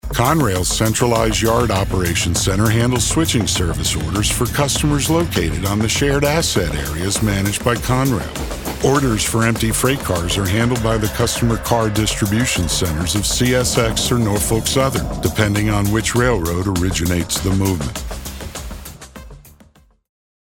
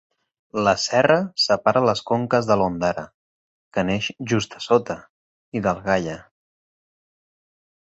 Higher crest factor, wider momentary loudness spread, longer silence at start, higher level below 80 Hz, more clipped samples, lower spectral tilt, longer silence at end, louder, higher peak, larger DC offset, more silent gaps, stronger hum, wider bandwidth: about the same, 16 dB vs 20 dB; second, 6 LU vs 14 LU; second, 0.05 s vs 0.55 s; first, -30 dBFS vs -54 dBFS; neither; about the same, -4.5 dB/octave vs -5 dB/octave; second, 0.95 s vs 1.6 s; first, -17 LUFS vs -21 LUFS; about the same, -2 dBFS vs -2 dBFS; neither; second, none vs 3.14-3.71 s, 5.09-5.52 s; neither; first, 19.5 kHz vs 8.2 kHz